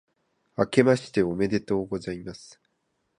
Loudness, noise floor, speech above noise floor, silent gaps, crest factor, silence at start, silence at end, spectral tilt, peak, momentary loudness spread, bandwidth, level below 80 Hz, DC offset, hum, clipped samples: -25 LUFS; -75 dBFS; 50 dB; none; 24 dB; 0.6 s; 0.8 s; -6.5 dB/octave; -4 dBFS; 18 LU; 11 kHz; -56 dBFS; under 0.1%; none; under 0.1%